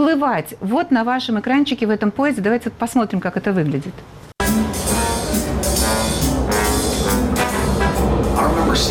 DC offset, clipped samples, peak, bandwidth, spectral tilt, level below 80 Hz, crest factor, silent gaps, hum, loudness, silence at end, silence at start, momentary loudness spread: under 0.1%; under 0.1%; -6 dBFS; 17.5 kHz; -4.5 dB/octave; -28 dBFS; 12 dB; none; none; -18 LUFS; 0 s; 0 s; 4 LU